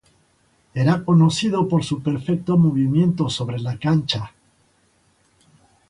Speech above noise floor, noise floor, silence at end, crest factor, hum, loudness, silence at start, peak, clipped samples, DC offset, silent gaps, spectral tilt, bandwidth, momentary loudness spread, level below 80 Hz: 42 dB; -61 dBFS; 1.6 s; 16 dB; none; -20 LUFS; 0.75 s; -4 dBFS; under 0.1%; under 0.1%; none; -6.5 dB/octave; 11 kHz; 9 LU; -54 dBFS